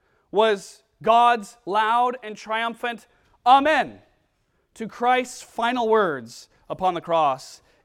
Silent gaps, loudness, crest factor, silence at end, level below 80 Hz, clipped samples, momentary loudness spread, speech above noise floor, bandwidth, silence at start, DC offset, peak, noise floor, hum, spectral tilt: none; -22 LUFS; 20 dB; 0.3 s; -64 dBFS; under 0.1%; 17 LU; 47 dB; 14.5 kHz; 0.35 s; under 0.1%; -4 dBFS; -69 dBFS; none; -4 dB/octave